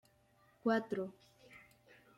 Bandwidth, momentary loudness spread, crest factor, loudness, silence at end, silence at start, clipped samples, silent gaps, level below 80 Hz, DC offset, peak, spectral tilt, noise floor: 13.5 kHz; 24 LU; 20 dB; -38 LUFS; 0.6 s; 0.65 s; under 0.1%; none; -82 dBFS; under 0.1%; -22 dBFS; -6.5 dB/octave; -71 dBFS